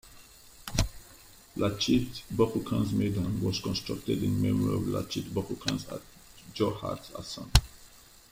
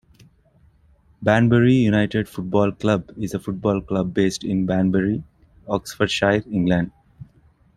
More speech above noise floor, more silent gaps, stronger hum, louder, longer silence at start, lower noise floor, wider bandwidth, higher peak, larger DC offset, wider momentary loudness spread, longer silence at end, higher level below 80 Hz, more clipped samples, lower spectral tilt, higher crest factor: second, 25 dB vs 37 dB; neither; neither; second, -30 LUFS vs -21 LUFS; second, 0.05 s vs 1.2 s; about the same, -54 dBFS vs -56 dBFS; first, 16.5 kHz vs 13.5 kHz; about the same, -2 dBFS vs -2 dBFS; neither; first, 16 LU vs 11 LU; second, 0.35 s vs 0.55 s; first, -40 dBFS vs -48 dBFS; neither; about the same, -5.5 dB/octave vs -6.5 dB/octave; first, 28 dB vs 18 dB